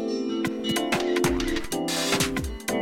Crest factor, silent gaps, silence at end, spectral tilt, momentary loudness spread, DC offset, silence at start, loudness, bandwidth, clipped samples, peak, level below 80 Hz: 18 dB; none; 0 s; -3.5 dB/octave; 5 LU; under 0.1%; 0 s; -26 LUFS; 17 kHz; under 0.1%; -8 dBFS; -40 dBFS